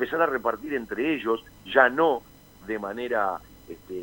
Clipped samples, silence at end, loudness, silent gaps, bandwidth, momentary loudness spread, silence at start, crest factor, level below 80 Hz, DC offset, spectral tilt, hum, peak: under 0.1%; 0 s; -25 LUFS; none; 16.5 kHz; 18 LU; 0 s; 24 dB; -58 dBFS; under 0.1%; -5.5 dB/octave; none; -2 dBFS